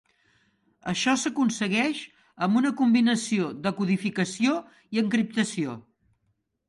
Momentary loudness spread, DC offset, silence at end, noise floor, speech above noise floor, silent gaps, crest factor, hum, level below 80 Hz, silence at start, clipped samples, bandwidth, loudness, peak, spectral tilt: 10 LU; under 0.1%; 0.9 s; -74 dBFS; 49 dB; none; 18 dB; none; -68 dBFS; 0.85 s; under 0.1%; 11.5 kHz; -26 LUFS; -10 dBFS; -4.5 dB/octave